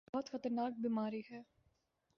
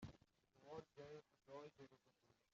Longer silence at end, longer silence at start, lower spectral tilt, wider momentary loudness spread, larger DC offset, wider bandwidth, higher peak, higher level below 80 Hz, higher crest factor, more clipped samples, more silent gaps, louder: first, 0.75 s vs 0.2 s; first, 0.15 s vs 0 s; about the same, -5.5 dB/octave vs -5.5 dB/octave; first, 13 LU vs 7 LU; neither; about the same, 6.8 kHz vs 7.4 kHz; first, -26 dBFS vs -42 dBFS; about the same, -82 dBFS vs -80 dBFS; about the same, 16 dB vs 20 dB; neither; neither; first, -41 LUFS vs -61 LUFS